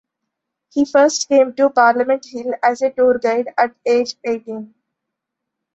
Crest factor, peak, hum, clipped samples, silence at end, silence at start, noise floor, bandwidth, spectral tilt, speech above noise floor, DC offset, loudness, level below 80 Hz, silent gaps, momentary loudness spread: 16 dB; -2 dBFS; none; under 0.1%; 1.1 s; 0.75 s; -80 dBFS; 8.2 kHz; -3 dB/octave; 64 dB; under 0.1%; -17 LUFS; -64 dBFS; none; 11 LU